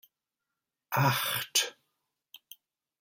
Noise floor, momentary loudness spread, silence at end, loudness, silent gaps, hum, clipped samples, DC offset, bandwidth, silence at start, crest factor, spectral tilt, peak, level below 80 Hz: -88 dBFS; 7 LU; 1.3 s; -29 LUFS; none; none; under 0.1%; under 0.1%; 16.5 kHz; 0.9 s; 24 dB; -2.5 dB/octave; -12 dBFS; -72 dBFS